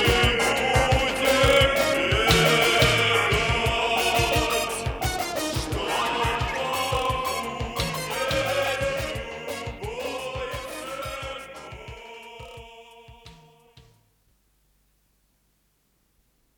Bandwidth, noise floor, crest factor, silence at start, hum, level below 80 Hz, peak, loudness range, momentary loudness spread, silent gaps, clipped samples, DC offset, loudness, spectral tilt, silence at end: over 20 kHz; -68 dBFS; 20 dB; 0 s; none; -38 dBFS; -6 dBFS; 18 LU; 18 LU; none; under 0.1%; under 0.1%; -23 LUFS; -3.5 dB/octave; 3.25 s